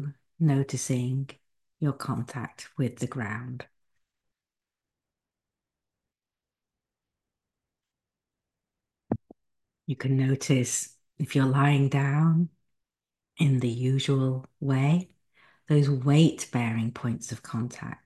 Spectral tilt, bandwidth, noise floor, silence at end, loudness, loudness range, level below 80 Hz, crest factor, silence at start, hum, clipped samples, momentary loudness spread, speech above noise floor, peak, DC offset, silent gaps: -6 dB/octave; 12.5 kHz; under -90 dBFS; 0.1 s; -27 LUFS; 15 LU; -64 dBFS; 20 dB; 0 s; none; under 0.1%; 14 LU; over 64 dB; -8 dBFS; under 0.1%; none